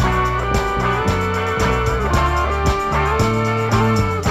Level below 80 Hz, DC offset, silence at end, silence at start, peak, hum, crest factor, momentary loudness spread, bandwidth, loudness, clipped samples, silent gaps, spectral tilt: -26 dBFS; under 0.1%; 0 s; 0 s; -4 dBFS; none; 14 dB; 2 LU; 15 kHz; -18 LUFS; under 0.1%; none; -6 dB/octave